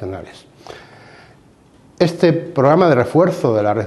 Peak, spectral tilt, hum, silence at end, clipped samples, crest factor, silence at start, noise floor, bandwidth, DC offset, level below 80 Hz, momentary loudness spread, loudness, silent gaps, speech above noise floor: 0 dBFS; -7.5 dB/octave; none; 0 s; under 0.1%; 18 dB; 0 s; -49 dBFS; 12.5 kHz; under 0.1%; -54 dBFS; 17 LU; -15 LUFS; none; 33 dB